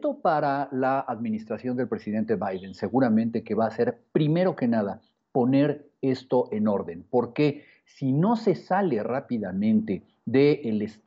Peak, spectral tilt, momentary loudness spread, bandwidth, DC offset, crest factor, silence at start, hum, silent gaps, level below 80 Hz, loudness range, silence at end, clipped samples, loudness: -10 dBFS; -9 dB/octave; 8 LU; 7.4 kHz; under 0.1%; 16 dB; 0 s; none; none; -70 dBFS; 2 LU; 0.15 s; under 0.1%; -26 LUFS